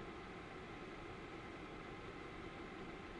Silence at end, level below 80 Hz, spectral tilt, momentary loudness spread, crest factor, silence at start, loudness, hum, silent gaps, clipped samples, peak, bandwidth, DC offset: 0 s; -62 dBFS; -5.5 dB/octave; 1 LU; 12 dB; 0 s; -51 LUFS; none; none; under 0.1%; -38 dBFS; 11 kHz; under 0.1%